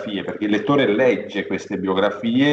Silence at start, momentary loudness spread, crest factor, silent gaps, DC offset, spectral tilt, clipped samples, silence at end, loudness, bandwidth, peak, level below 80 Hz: 0 s; 8 LU; 14 dB; none; under 0.1%; -6.5 dB/octave; under 0.1%; 0 s; -20 LUFS; 7.8 kHz; -6 dBFS; -64 dBFS